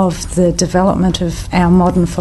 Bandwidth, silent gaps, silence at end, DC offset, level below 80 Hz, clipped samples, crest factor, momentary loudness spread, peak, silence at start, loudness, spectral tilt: 12.5 kHz; none; 0 s; under 0.1%; -26 dBFS; under 0.1%; 12 dB; 5 LU; -2 dBFS; 0 s; -13 LUFS; -6 dB/octave